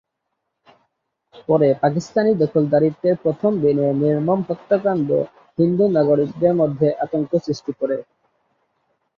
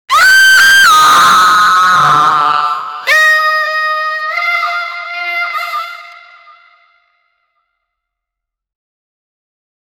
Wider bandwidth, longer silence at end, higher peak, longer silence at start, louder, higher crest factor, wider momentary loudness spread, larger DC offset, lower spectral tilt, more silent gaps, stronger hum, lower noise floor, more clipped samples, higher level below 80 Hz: second, 7.4 kHz vs over 20 kHz; second, 1.15 s vs 3.85 s; second, -4 dBFS vs 0 dBFS; first, 1.35 s vs 0.1 s; second, -19 LUFS vs -8 LUFS; about the same, 16 dB vs 12 dB; second, 7 LU vs 14 LU; neither; first, -8.5 dB/octave vs 0 dB/octave; neither; neither; about the same, -77 dBFS vs -80 dBFS; neither; second, -62 dBFS vs -52 dBFS